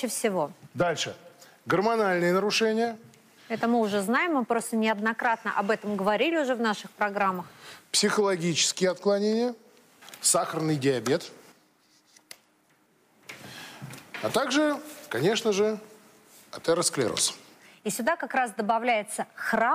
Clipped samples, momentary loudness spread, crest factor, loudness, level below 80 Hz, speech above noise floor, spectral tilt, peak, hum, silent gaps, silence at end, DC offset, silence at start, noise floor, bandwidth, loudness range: under 0.1%; 18 LU; 18 dB; -26 LUFS; -72 dBFS; 39 dB; -3.5 dB/octave; -10 dBFS; none; none; 0 s; under 0.1%; 0 s; -65 dBFS; 15.5 kHz; 6 LU